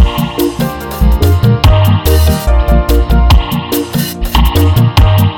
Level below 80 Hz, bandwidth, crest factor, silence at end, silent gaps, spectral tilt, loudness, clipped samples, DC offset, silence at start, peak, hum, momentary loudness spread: -12 dBFS; 18 kHz; 8 dB; 0 s; none; -6 dB/octave; -11 LUFS; 0.4%; under 0.1%; 0 s; 0 dBFS; none; 6 LU